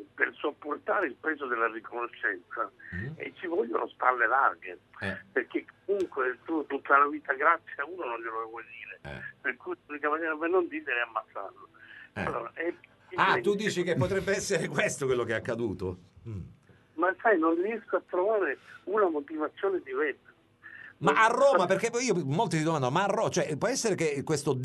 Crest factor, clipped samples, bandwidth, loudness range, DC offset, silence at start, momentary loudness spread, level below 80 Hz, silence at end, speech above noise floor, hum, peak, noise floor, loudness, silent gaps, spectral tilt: 22 dB; under 0.1%; 12 kHz; 6 LU; under 0.1%; 0 s; 16 LU; -64 dBFS; 0 s; 23 dB; none; -8 dBFS; -52 dBFS; -29 LUFS; none; -4.5 dB/octave